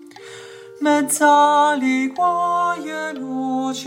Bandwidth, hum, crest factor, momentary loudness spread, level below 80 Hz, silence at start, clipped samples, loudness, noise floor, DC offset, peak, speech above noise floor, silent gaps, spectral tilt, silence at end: 16.5 kHz; none; 14 dB; 20 LU; -82 dBFS; 0.05 s; under 0.1%; -18 LUFS; -38 dBFS; under 0.1%; -4 dBFS; 21 dB; none; -2.5 dB/octave; 0 s